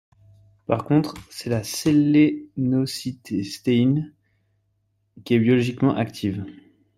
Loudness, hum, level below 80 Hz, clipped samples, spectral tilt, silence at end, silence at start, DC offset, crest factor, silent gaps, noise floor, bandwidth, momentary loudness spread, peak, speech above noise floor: -22 LUFS; none; -58 dBFS; under 0.1%; -6.5 dB/octave; 0.45 s; 0.7 s; under 0.1%; 18 dB; none; -70 dBFS; 15.5 kHz; 13 LU; -4 dBFS; 48 dB